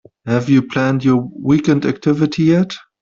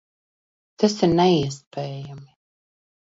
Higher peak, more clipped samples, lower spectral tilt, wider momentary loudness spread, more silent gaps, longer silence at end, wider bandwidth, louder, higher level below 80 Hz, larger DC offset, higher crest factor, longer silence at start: about the same, -2 dBFS vs -4 dBFS; neither; first, -7.5 dB/octave vs -6 dB/octave; second, 4 LU vs 16 LU; second, none vs 1.67-1.71 s; second, 0.25 s vs 0.85 s; about the same, 7.4 kHz vs 7.8 kHz; first, -16 LUFS vs -21 LUFS; about the same, -52 dBFS vs -54 dBFS; neither; second, 14 dB vs 20 dB; second, 0.25 s vs 0.8 s